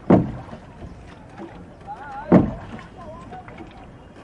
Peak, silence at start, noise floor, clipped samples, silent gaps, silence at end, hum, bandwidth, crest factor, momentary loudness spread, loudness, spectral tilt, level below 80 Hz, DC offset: 0 dBFS; 0.05 s; -42 dBFS; under 0.1%; none; 0 s; none; 7.2 kHz; 24 dB; 24 LU; -20 LUFS; -10 dB/octave; -44 dBFS; under 0.1%